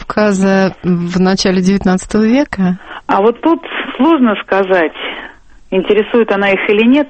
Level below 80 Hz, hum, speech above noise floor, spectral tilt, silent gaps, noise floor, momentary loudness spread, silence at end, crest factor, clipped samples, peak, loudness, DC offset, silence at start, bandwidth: -40 dBFS; none; 23 dB; -6 dB/octave; none; -35 dBFS; 7 LU; 0 s; 12 dB; under 0.1%; 0 dBFS; -13 LUFS; under 0.1%; 0 s; 8.8 kHz